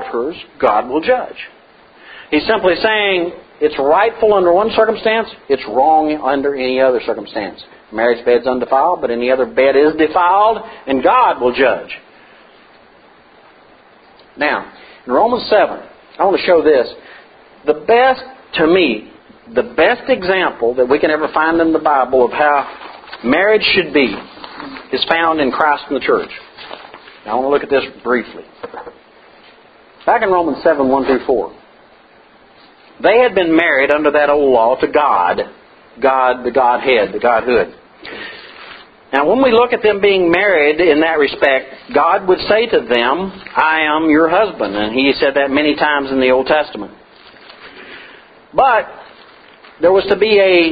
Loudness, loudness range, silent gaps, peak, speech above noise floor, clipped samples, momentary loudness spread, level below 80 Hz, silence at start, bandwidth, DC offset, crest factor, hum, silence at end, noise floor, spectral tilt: -14 LUFS; 6 LU; none; 0 dBFS; 32 dB; under 0.1%; 17 LU; -48 dBFS; 0 s; 5 kHz; under 0.1%; 14 dB; none; 0 s; -46 dBFS; -7.5 dB/octave